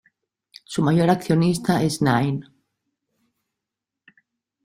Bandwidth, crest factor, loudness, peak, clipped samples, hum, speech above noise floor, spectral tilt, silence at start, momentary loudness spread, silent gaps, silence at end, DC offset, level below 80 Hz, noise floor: 15 kHz; 18 dB; -21 LUFS; -4 dBFS; under 0.1%; none; 66 dB; -6.5 dB/octave; 0.7 s; 8 LU; none; 2.2 s; under 0.1%; -56 dBFS; -85 dBFS